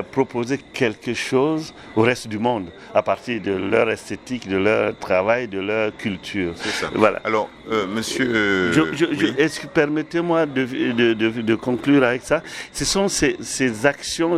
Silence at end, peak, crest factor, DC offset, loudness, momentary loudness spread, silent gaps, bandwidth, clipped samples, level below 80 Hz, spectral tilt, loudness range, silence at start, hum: 0 s; 0 dBFS; 20 dB; under 0.1%; -21 LUFS; 7 LU; none; 14.5 kHz; under 0.1%; -50 dBFS; -4.5 dB/octave; 2 LU; 0 s; none